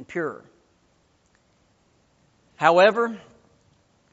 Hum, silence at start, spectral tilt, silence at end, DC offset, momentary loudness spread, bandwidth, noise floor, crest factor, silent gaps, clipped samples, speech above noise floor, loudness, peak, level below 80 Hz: none; 0 s; -2.5 dB/octave; 0.95 s; under 0.1%; 23 LU; 8 kHz; -64 dBFS; 24 dB; none; under 0.1%; 43 dB; -20 LUFS; -2 dBFS; -70 dBFS